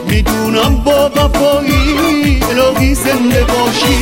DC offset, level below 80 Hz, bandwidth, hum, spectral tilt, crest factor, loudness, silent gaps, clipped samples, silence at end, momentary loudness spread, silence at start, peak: under 0.1%; -18 dBFS; 17 kHz; none; -5 dB/octave; 10 dB; -11 LUFS; none; under 0.1%; 0 s; 1 LU; 0 s; 0 dBFS